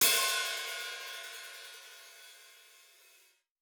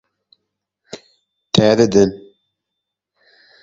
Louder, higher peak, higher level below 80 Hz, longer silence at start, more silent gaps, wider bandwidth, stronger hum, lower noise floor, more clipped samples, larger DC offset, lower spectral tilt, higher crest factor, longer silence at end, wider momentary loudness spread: second, -33 LUFS vs -14 LUFS; second, -12 dBFS vs 0 dBFS; second, -84 dBFS vs -50 dBFS; second, 0 s vs 0.95 s; neither; first, over 20 kHz vs 7.8 kHz; neither; second, -66 dBFS vs -80 dBFS; neither; neither; second, 2.5 dB/octave vs -5.5 dB/octave; first, 26 dB vs 20 dB; second, 1.05 s vs 1.45 s; about the same, 25 LU vs 25 LU